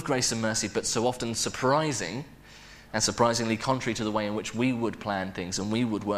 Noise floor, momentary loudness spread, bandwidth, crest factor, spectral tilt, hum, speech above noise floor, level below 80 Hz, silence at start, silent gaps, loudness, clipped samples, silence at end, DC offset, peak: -49 dBFS; 8 LU; 15.5 kHz; 20 dB; -3.5 dB/octave; none; 22 dB; -54 dBFS; 0 s; none; -28 LUFS; under 0.1%; 0 s; under 0.1%; -8 dBFS